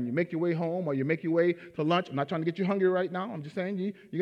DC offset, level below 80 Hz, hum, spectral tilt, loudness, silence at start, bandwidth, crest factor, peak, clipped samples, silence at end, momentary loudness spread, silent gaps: under 0.1%; -80 dBFS; none; -8.5 dB/octave; -30 LUFS; 0 s; 6.8 kHz; 16 dB; -14 dBFS; under 0.1%; 0 s; 8 LU; none